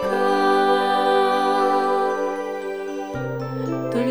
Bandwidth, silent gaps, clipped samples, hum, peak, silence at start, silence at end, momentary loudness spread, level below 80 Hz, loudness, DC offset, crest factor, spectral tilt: over 20 kHz; none; under 0.1%; none; -6 dBFS; 0 s; 0 s; 10 LU; -58 dBFS; -21 LUFS; 0.4%; 14 dB; -5.5 dB/octave